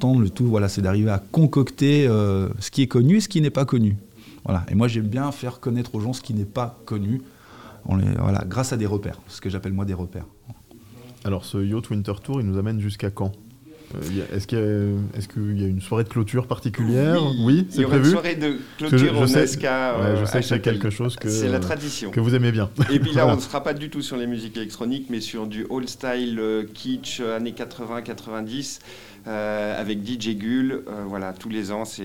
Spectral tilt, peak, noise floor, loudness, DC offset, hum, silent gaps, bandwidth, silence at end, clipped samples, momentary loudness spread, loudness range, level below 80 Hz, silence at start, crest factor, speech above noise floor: -6.5 dB/octave; -4 dBFS; -46 dBFS; -23 LUFS; 0.2%; none; none; 16.5 kHz; 0 s; under 0.1%; 12 LU; 8 LU; -52 dBFS; 0 s; 18 dB; 24 dB